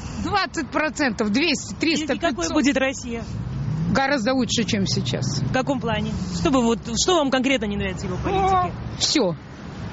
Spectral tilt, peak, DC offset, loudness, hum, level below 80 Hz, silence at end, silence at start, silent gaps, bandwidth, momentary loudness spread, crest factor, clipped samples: -4 dB/octave; -6 dBFS; under 0.1%; -22 LUFS; none; -40 dBFS; 0 s; 0 s; none; 8 kHz; 8 LU; 16 dB; under 0.1%